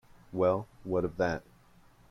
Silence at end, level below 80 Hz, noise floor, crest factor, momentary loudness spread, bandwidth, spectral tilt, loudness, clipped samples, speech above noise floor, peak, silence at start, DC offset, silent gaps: 0.7 s; -58 dBFS; -60 dBFS; 18 dB; 9 LU; 11 kHz; -7.5 dB/octave; -32 LUFS; under 0.1%; 29 dB; -16 dBFS; 0.3 s; under 0.1%; none